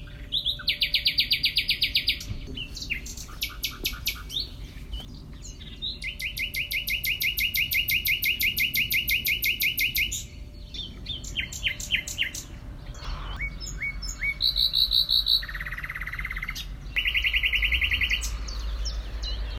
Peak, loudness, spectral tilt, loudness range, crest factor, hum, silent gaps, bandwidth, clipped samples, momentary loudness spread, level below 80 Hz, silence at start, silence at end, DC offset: -10 dBFS; -25 LUFS; -1 dB/octave; 8 LU; 18 dB; none; none; 16.5 kHz; under 0.1%; 16 LU; -38 dBFS; 0 s; 0 s; under 0.1%